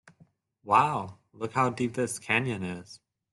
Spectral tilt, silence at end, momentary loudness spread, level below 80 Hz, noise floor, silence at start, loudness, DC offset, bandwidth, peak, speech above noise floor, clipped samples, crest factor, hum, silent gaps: -5 dB/octave; 0.35 s; 15 LU; -68 dBFS; -63 dBFS; 0.65 s; -28 LUFS; under 0.1%; 12.5 kHz; -8 dBFS; 35 dB; under 0.1%; 22 dB; none; none